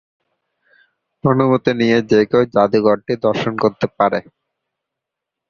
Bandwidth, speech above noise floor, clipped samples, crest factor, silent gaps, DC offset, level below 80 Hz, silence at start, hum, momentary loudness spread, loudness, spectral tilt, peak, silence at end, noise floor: 7.2 kHz; 67 dB; under 0.1%; 16 dB; none; under 0.1%; -54 dBFS; 1.25 s; none; 5 LU; -16 LUFS; -7.5 dB/octave; -2 dBFS; 1.3 s; -82 dBFS